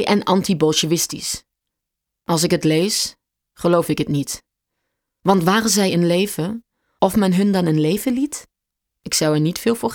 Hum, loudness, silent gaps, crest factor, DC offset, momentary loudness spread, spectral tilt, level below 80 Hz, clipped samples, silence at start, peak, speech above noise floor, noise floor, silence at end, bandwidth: none; -19 LUFS; none; 18 dB; under 0.1%; 10 LU; -4.5 dB/octave; -52 dBFS; under 0.1%; 0 s; -2 dBFS; 64 dB; -82 dBFS; 0 s; 19.5 kHz